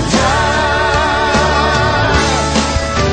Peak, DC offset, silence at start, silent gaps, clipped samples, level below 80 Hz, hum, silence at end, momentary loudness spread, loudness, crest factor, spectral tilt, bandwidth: 0 dBFS; under 0.1%; 0 s; none; under 0.1%; -22 dBFS; none; 0 s; 2 LU; -13 LUFS; 12 dB; -4 dB/octave; 10 kHz